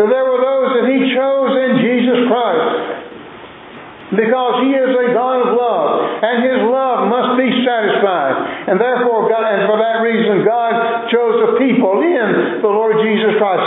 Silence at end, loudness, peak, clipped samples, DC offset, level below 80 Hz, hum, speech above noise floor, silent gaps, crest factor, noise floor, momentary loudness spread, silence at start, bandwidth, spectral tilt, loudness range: 0 s; -14 LUFS; 0 dBFS; under 0.1%; under 0.1%; -66 dBFS; none; 21 dB; none; 12 dB; -34 dBFS; 5 LU; 0 s; 4.1 kHz; -10 dB/octave; 2 LU